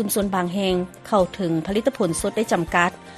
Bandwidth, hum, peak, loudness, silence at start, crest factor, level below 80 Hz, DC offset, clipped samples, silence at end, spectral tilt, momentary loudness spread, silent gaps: 13.5 kHz; none; -2 dBFS; -22 LUFS; 0 s; 20 dB; -46 dBFS; under 0.1%; under 0.1%; 0 s; -4.5 dB/octave; 3 LU; none